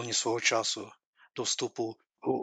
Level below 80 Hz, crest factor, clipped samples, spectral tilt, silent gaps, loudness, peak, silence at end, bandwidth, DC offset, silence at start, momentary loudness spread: -82 dBFS; 22 dB; under 0.1%; -2 dB/octave; 1.06-1.13 s; -31 LUFS; -12 dBFS; 0 s; 10 kHz; under 0.1%; 0 s; 12 LU